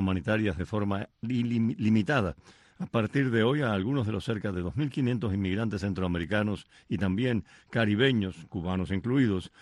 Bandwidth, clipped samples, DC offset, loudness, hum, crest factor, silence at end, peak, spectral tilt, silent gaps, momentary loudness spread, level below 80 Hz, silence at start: 11.5 kHz; under 0.1%; under 0.1%; -29 LUFS; none; 16 dB; 0.15 s; -12 dBFS; -7.5 dB/octave; none; 7 LU; -54 dBFS; 0 s